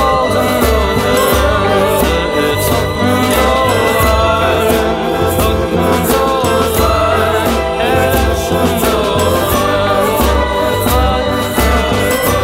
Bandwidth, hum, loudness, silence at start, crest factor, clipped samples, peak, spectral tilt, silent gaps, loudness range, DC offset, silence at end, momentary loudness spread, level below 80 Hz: 16.5 kHz; none; -12 LUFS; 0 s; 12 dB; under 0.1%; 0 dBFS; -4.5 dB/octave; none; 1 LU; under 0.1%; 0 s; 2 LU; -22 dBFS